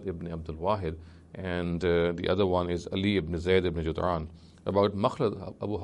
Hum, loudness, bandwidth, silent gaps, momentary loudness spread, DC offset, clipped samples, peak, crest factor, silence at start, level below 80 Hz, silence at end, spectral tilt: none; -29 LUFS; 11 kHz; none; 11 LU; under 0.1%; under 0.1%; -10 dBFS; 18 dB; 0 s; -48 dBFS; 0 s; -7.5 dB/octave